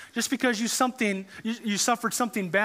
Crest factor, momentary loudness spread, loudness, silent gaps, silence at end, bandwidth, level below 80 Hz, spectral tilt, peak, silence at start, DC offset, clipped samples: 18 dB; 7 LU; -26 LUFS; none; 0 s; 16 kHz; -74 dBFS; -3 dB/octave; -8 dBFS; 0 s; under 0.1%; under 0.1%